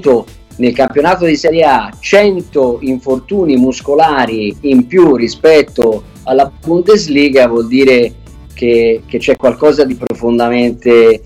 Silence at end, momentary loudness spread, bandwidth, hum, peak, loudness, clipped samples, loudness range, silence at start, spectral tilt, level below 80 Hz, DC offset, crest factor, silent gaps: 0 s; 7 LU; 13 kHz; none; 0 dBFS; -10 LUFS; under 0.1%; 2 LU; 0 s; -5.5 dB/octave; -38 dBFS; under 0.1%; 10 dB; none